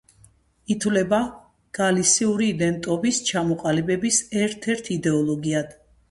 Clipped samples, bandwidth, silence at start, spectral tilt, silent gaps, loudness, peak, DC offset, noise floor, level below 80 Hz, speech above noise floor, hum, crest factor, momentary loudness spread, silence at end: under 0.1%; 11.5 kHz; 0.7 s; -4 dB/octave; none; -22 LUFS; -6 dBFS; under 0.1%; -56 dBFS; -56 dBFS; 34 dB; none; 18 dB; 8 LU; 0.4 s